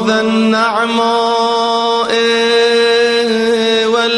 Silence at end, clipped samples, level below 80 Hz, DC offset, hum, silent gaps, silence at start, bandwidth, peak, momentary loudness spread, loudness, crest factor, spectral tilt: 0 s; under 0.1%; -54 dBFS; under 0.1%; none; none; 0 s; 11.5 kHz; -2 dBFS; 3 LU; -12 LUFS; 12 dB; -3.5 dB/octave